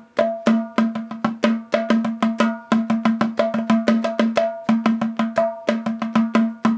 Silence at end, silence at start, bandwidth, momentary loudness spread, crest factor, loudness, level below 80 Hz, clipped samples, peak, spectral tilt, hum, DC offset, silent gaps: 0 s; 0.15 s; 8 kHz; 4 LU; 18 dB; -20 LUFS; -64 dBFS; under 0.1%; -2 dBFS; -6.5 dB/octave; none; under 0.1%; none